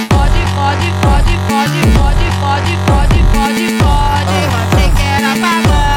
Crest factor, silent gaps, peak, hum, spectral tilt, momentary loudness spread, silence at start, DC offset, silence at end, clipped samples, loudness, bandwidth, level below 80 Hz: 10 dB; none; 0 dBFS; none; -5.5 dB/octave; 2 LU; 0 s; 0.3%; 0 s; under 0.1%; -12 LUFS; 17 kHz; -14 dBFS